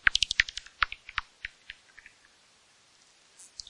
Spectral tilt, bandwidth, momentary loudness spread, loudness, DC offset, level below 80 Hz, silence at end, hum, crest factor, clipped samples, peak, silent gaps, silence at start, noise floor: 1.5 dB/octave; 11.5 kHz; 23 LU; -29 LUFS; under 0.1%; -54 dBFS; 1.95 s; none; 28 dB; under 0.1%; -6 dBFS; none; 0.05 s; -62 dBFS